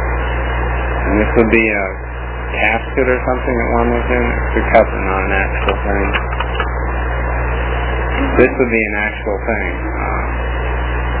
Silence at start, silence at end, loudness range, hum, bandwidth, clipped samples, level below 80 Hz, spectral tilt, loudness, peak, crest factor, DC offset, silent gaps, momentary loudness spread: 0 s; 0 s; 2 LU; 60 Hz at -20 dBFS; 4 kHz; under 0.1%; -20 dBFS; -10.5 dB/octave; -16 LUFS; 0 dBFS; 16 dB; under 0.1%; none; 7 LU